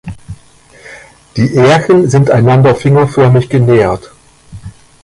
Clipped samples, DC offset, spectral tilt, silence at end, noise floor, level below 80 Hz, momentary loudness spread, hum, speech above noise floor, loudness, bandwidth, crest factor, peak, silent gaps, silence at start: under 0.1%; under 0.1%; -7.5 dB/octave; 0.35 s; -41 dBFS; -38 dBFS; 14 LU; none; 33 dB; -9 LUFS; 11.5 kHz; 10 dB; 0 dBFS; none; 0.05 s